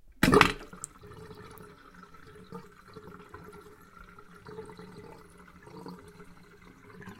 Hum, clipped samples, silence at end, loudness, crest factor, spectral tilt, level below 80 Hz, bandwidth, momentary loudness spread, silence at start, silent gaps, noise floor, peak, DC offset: none; under 0.1%; 0.05 s; -24 LUFS; 34 dB; -4.5 dB/octave; -52 dBFS; 16 kHz; 28 LU; 0.2 s; none; -54 dBFS; 0 dBFS; under 0.1%